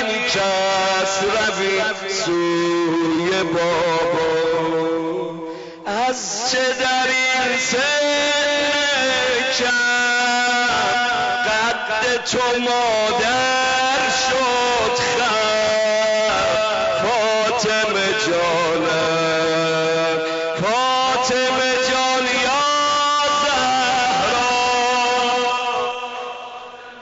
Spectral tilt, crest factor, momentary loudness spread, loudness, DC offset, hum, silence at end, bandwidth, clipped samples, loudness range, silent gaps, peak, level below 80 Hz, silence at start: -2 dB/octave; 8 dB; 4 LU; -18 LUFS; under 0.1%; none; 0 s; 8 kHz; under 0.1%; 3 LU; none; -12 dBFS; -52 dBFS; 0 s